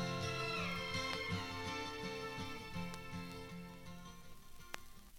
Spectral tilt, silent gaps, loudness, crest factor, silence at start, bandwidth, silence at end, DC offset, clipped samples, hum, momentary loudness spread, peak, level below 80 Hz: -4 dB/octave; none; -43 LUFS; 22 dB; 0 s; 17.5 kHz; 0 s; under 0.1%; under 0.1%; none; 15 LU; -22 dBFS; -60 dBFS